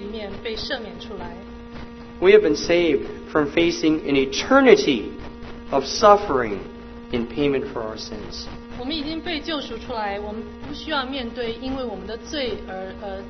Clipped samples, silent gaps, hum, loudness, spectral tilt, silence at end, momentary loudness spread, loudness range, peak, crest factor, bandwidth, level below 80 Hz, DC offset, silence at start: under 0.1%; none; none; -21 LUFS; -4.5 dB/octave; 0 s; 20 LU; 10 LU; 0 dBFS; 22 dB; 6.4 kHz; -42 dBFS; under 0.1%; 0 s